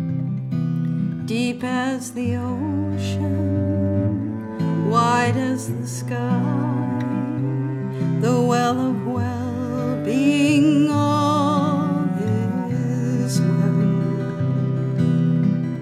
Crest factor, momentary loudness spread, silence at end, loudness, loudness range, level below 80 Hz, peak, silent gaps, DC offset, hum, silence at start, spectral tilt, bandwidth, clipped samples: 14 dB; 7 LU; 0 s; -21 LUFS; 4 LU; -60 dBFS; -6 dBFS; none; under 0.1%; none; 0 s; -7 dB/octave; 14 kHz; under 0.1%